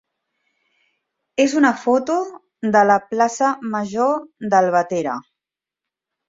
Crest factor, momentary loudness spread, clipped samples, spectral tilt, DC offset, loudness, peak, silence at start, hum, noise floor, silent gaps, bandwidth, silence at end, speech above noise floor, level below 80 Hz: 18 dB; 11 LU; under 0.1%; -5 dB/octave; under 0.1%; -19 LUFS; -2 dBFS; 1.4 s; none; -87 dBFS; none; 7.8 kHz; 1.05 s; 69 dB; -66 dBFS